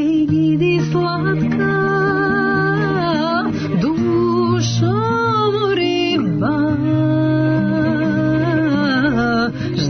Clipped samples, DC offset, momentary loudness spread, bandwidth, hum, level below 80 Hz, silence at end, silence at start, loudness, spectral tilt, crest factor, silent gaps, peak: under 0.1%; under 0.1%; 2 LU; 6.6 kHz; none; -44 dBFS; 0 s; 0 s; -17 LUFS; -7 dB/octave; 10 dB; none; -6 dBFS